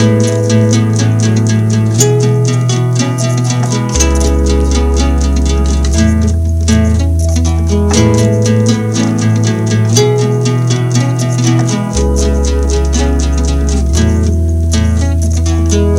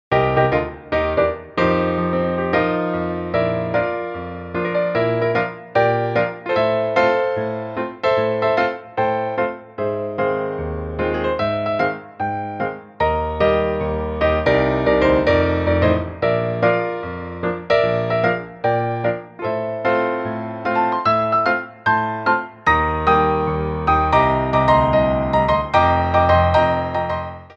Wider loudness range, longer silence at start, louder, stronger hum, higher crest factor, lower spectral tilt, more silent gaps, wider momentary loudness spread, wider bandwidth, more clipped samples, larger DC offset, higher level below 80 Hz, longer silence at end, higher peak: second, 2 LU vs 5 LU; about the same, 0 s vs 0.1 s; first, -11 LUFS vs -19 LUFS; neither; second, 10 dB vs 16 dB; second, -6 dB/octave vs -8 dB/octave; neither; second, 3 LU vs 9 LU; first, 15 kHz vs 7.4 kHz; neither; neither; first, -16 dBFS vs -36 dBFS; about the same, 0 s vs 0.05 s; about the same, 0 dBFS vs -2 dBFS